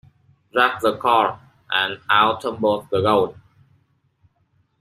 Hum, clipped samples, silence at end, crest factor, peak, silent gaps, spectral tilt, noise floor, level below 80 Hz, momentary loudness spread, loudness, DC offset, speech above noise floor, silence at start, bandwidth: none; under 0.1%; 1.5 s; 20 dB; -2 dBFS; none; -5 dB/octave; -64 dBFS; -60 dBFS; 7 LU; -20 LUFS; under 0.1%; 45 dB; 0.55 s; 14.5 kHz